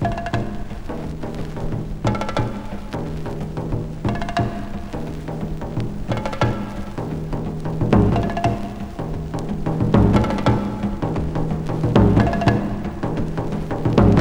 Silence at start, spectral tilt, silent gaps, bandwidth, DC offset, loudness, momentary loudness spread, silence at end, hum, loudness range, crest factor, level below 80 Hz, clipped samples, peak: 0 s; -8 dB/octave; none; 11 kHz; under 0.1%; -22 LUFS; 13 LU; 0 s; none; 7 LU; 18 dB; -30 dBFS; under 0.1%; -2 dBFS